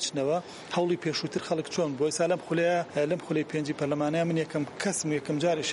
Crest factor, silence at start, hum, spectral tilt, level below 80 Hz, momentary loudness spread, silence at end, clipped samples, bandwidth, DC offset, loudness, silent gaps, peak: 14 dB; 0 s; none; -4.5 dB/octave; -70 dBFS; 4 LU; 0 s; under 0.1%; 11.5 kHz; under 0.1%; -29 LUFS; none; -14 dBFS